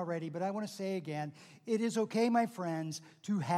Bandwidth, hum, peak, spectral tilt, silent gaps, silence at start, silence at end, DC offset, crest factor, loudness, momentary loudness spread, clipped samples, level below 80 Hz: 13.5 kHz; none; -18 dBFS; -6 dB/octave; none; 0 s; 0 s; under 0.1%; 18 dB; -36 LUFS; 12 LU; under 0.1%; -88 dBFS